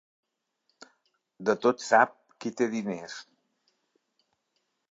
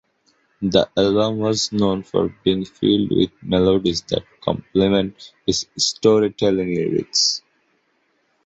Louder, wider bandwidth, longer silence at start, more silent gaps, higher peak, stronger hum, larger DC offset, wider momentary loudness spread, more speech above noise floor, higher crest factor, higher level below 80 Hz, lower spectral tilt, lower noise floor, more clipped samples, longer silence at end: second, -27 LUFS vs -19 LUFS; about the same, 7.8 kHz vs 8.2 kHz; first, 1.4 s vs 0.6 s; neither; second, -8 dBFS vs -2 dBFS; neither; neither; first, 16 LU vs 7 LU; first, 52 dB vs 47 dB; first, 24 dB vs 18 dB; second, -82 dBFS vs -48 dBFS; about the same, -4.5 dB/octave vs -4.5 dB/octave; first, -78 dBFS vs -66 dBFS; neither; first, 1.7 s vs 1.05 s